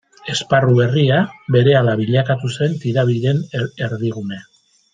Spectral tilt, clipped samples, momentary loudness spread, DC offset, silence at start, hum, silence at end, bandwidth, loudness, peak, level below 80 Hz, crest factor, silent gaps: -6.5 dB/octave; under 0.1%; 10 LU; under 0.1%; 0.25 s; none; 0.5 s; 9.2 kHz; -17 LUFS; -2 dBFS; -56 dBFS; 16 dB; none